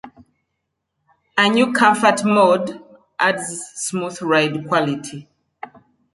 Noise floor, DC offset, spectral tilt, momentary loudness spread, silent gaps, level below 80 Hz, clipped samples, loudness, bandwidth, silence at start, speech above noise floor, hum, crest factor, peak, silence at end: -76 dBFS; under 0.1%; -4 dB/octave; 24 LU; none; -66 dBFS; under 0.1%; -18 LUFS; 11.5 kHz; 0.05 s; 59 dB; none; 18 dB; -2 dBFS; 0.9 s